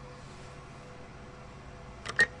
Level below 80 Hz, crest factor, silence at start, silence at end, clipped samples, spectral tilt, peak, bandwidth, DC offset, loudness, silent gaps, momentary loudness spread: -54 dBFS; 26 dB; 0 s; 0 s; under 0.1%; -3 dB/octave; -12 dBFS; 11.5 kHz; under 0.1%; -30 LUFS; none; 21 LU